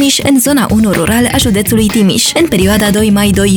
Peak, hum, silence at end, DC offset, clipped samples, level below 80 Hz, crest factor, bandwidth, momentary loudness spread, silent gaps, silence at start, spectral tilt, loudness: 0 dBFS; none; 0 s; 0.2%; under 0.1%; -28 dBFS; 8 dB; over 20 kHz; 1 LU; none; 0 s; -4 dB/octave; -9 LUFS